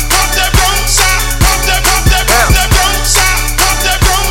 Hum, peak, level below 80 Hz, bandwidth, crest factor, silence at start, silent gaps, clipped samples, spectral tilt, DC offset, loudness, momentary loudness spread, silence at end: none; 0 dBFS; -14 dBFS; 17.5 kHz; 10 dB; 0 s; none; 0.2%; -2 dB/octave; under 0.1%; -9 LUFS; 2 LU; 0 s